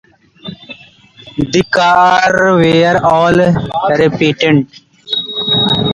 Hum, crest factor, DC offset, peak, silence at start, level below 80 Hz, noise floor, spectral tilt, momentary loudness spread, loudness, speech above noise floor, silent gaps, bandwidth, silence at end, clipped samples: none; 12 dB; under 0.1%; 0 dBFS; 0.45 s; -42 dBFS; -40 dBFS; -5.5 dB/octave; 18 LU; -11 LUFS; 30 dB; none; 11 kHz; 0 s; under 0.1%